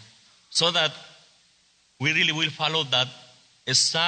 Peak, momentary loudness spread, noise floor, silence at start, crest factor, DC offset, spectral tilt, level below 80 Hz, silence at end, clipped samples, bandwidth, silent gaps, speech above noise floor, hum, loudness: -8 dBFS; 8 LU; -63 dBFS; 0 s; 20 dB; under 0.1%; -2 dB/octave; -72 dBFS; 0 s; under 0.1%; 9.4 kHz; none; 39 dB; none; -23 LUFS